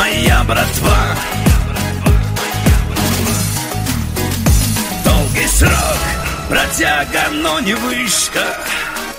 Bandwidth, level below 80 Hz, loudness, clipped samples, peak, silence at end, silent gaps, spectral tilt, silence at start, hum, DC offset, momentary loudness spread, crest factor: 16.5 kHz; -20 dBFS; -14 LUFS; under 0.1%; 0 dBFS; 0 s; none; -4 dB/octave; 0 s; none; under 0.1%; 6 LU; 14 dB